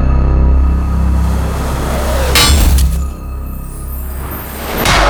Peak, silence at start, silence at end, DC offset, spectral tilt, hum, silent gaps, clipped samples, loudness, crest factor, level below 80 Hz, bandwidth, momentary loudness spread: 0 dBFS; 0 s; 0 s; under 0.1%; -4 dB/octave; none; none; under 0.1%; -14 LUFS; 12 dB; -14 dBFS; over 20 kHz; 16 LU